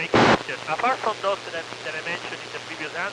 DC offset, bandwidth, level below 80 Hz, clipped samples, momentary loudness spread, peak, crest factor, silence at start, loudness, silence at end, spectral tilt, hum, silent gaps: under 0.1%; 13.5 kHz; -54 dBFS; under 0.1%; 14 LU; -6 dBFS; 20 dB; 0 s; -25 LUFS; 0 s; -4.5 dB/octave; none; none